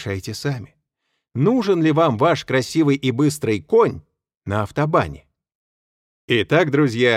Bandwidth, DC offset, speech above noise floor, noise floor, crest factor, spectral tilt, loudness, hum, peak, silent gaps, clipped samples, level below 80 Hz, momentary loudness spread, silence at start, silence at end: 15 kHz; under 0.1%; 57 dB; -75 dBFS; 16 dB; -6 dB/octave; -19 LUFS; none; -2 dBFS; 5.55-6.28 s; under 0.1%; -52 dBFS; 10 LU; 0 s; 0 s